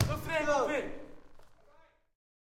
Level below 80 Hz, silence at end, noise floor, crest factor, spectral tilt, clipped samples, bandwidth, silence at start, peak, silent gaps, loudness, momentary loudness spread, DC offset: -52 dBFS; 1 s; -62 dBFS; 22 dB; -5.5 dB/octave; under 0.1%; 16.5 kHz; 0 s; -12 dBFS; none; -32 LUFS; 20 LU; under 0.1%